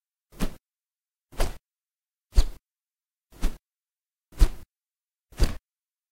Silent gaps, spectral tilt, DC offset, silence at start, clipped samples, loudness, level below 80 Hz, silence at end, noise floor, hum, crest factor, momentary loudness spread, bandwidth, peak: none; -5 dB/octave; under 0.1%; 0.4 s; under 0.1%; -32 LUFS; -30 dBFS; 0.55 s; under -90 dBFS; none; 24 dB; 22 LU; 16 kHz; -4 dBFS